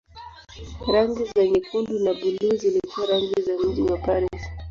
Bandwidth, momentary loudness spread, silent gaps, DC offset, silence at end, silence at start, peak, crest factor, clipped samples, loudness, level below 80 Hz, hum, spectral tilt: 7.4 kHz; 17 LU; none; under 0.1%; 0 s; 0.15 s; -8 dBFS; 16 dB; under 0.1%; -23 LUFS; -42 dBFS; none; -6 dB/octave